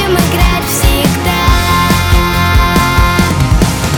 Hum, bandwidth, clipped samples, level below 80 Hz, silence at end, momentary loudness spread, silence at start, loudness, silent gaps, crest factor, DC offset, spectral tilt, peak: none; over 20 kHz; under 0.1%; -14 dBFS; 0 s; 2 LU; 0 s; -10 LUFS; none; 10 dB; under 0.1%; -4.5 dB/octave; 0 dBFS